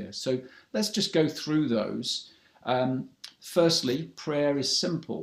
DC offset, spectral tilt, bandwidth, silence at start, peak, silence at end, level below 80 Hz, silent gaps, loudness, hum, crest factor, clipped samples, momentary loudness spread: under 0.1%; -4.5 dB/octave; 15.5 kHz; 0 s; -10 dBFS; 0 s; -70 dBFS; none; -28 LUFS; none; 18 dB; under 0.1%; 10 LU